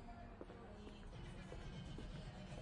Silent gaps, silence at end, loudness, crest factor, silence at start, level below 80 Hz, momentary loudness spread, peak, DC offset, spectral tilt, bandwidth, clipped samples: none; 0 s; -55 LUFS; 14 dB; 0 s; -58 dBFS; 4 LU; -38 dBFS; under 0.1%; -6 dB/octave; 11 kHz; under 0.1%